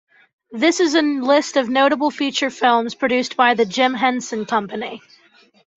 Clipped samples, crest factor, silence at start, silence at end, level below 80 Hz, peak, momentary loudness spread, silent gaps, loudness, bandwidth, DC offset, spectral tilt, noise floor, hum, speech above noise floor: under 0.1%; 16 dB; 0.5 s; 0.8 s; -66 dBFS; -2 dBFS; 10 LU; none; -18 LUFS; 8.2 kHz; under 0.1%; -3 dB/octave; -53 dBFS; none; 35 dB